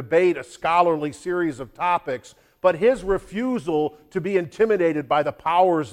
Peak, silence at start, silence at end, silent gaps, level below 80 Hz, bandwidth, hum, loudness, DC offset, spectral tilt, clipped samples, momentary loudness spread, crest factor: -4 dBFS; 0 s; 0 s; none; -50 dBFS; 14 kHz; none; -22 LUFS; under 0.1%; -6 dB/octave; under 0.1%; 8 LU; 18 dB